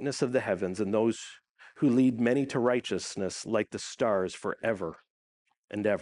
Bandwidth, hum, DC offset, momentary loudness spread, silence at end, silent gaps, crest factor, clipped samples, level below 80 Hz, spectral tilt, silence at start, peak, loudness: 11 kHz; none; under 0.1%; 10 LU; 0 s; 5.10-5.45 s, 5.58-5.68 s; 18 dB; under 0.1%; -70 dBFS; -5.5 dB/octave; 0 s; -12 dBFS; -29 LUFS